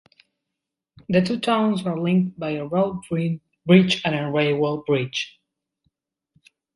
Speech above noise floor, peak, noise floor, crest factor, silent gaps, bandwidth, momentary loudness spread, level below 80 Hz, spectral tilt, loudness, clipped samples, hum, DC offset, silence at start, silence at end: 63 dB; -2 dBFS; -84 dBFS; 20 dB; none; 11.5 kHz; 11 LU; -60 dBFS; -6.5 dB/octave; -22 LUFS; under 0.1%; none; under 0.1%; 1.1 s; 1.45 s